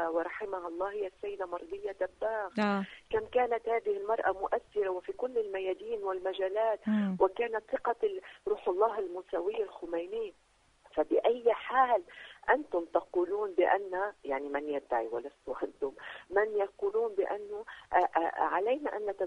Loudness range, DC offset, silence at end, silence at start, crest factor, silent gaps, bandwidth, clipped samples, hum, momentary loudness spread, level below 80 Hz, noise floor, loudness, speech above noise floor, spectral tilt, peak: 4 LU; under 0.1%; 0 s; 0 s; 20 dB; none; 10 kHz; under 0.1%; none; 10 LU; -66 dBFS; -63 dBFS; -33 LUFS; 31 dB; -7 dB/octave; -12 dBFS